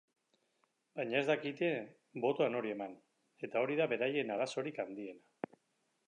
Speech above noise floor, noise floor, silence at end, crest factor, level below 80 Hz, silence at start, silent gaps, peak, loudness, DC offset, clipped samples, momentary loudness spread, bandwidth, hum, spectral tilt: 44 dB; -80 dBFS; 0.9 s; 20 dB; under -90 dBFS; 0.95 s; none; -18 dBFS; -37 LUFS; under 0.1%; under 0.1%; 15 LU; 9.8 kHz; none; -5.5 dB/octave